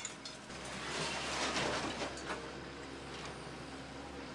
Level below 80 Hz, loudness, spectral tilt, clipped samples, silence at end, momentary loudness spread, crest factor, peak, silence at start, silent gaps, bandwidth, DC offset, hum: -60 dBFS; -40 LUFS; -3 dB/octave; under 0.1%; 0 s; 11 LU; 20 dB; -22 dBFS; 0 s; none; 11.5 kHz; under 0.1%; none